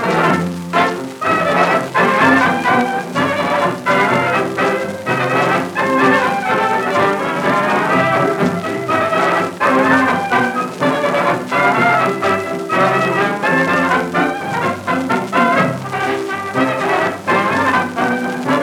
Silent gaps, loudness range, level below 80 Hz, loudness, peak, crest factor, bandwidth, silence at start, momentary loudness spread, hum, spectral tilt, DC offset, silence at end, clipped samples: none; 2 LU; -56 dBFS; -15 LUFS; 0 dBFS; 16 dB; 18.5 kHz; 0 s; 6 LU; none; -5.5 dB/octave; under 0.1%; 0 s; under 0.1%